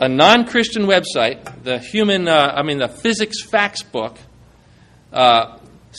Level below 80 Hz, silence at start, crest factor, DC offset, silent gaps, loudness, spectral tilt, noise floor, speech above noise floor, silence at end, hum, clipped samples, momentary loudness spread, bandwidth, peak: -54 dBFS; 0 s; 18 dB; under 0.1%; none; -16 LUFS; -4 dB/octave; -48 dBFS; 32 dB; 0 s; none; under 0.1%; 14 LU; 12.5 kHz; 0 dBFS